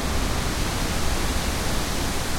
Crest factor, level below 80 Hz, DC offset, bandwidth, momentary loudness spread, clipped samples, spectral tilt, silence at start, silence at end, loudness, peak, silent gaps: 12 dB; -28 dBFS; under 0.1%; 16.5 kHz; 1 LU; under 0.1%; -3.5 dB/octave; 0 s; 0 s; -26 LUFS; -12 dBFS; none